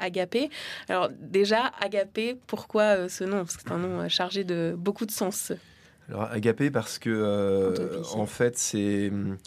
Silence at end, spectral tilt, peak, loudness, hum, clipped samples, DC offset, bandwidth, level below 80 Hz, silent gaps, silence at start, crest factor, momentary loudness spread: 0.1 s; -4.5 dB/octave; -8 dBFS; -28 LUFS; none; under 0.1%; under 0.1%; 14.5 kHz; -66 dBFS; none; 0 s; 18 dB; 8 LU